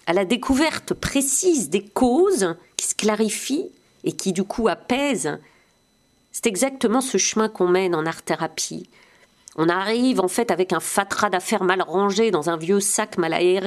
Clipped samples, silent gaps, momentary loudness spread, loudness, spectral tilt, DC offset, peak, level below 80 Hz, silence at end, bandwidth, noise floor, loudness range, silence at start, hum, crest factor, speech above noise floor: under 0.1%; none; 7 LU; -21 LUFS; -3.5 dB/octave; under 0.1%; 0 dBFS; -50 dBFS; 0 s; 14.5 kHz; -62 dBFS; 3 LU; 0.05 s; none; 22 dB; 41 dB